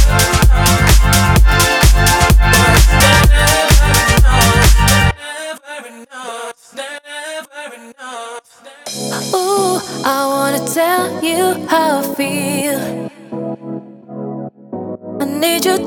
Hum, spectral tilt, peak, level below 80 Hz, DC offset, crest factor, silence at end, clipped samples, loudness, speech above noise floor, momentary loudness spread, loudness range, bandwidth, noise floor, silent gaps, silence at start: none; -4 dB/octave; 0 dBFS; -16 dBFS; under 0.1%; 12 dB; 0 s; under 0.1%; -12 LUFS; 21 dB; 19 LU; 15 LU; 19 kHz; -37 dBFS; none; 0 s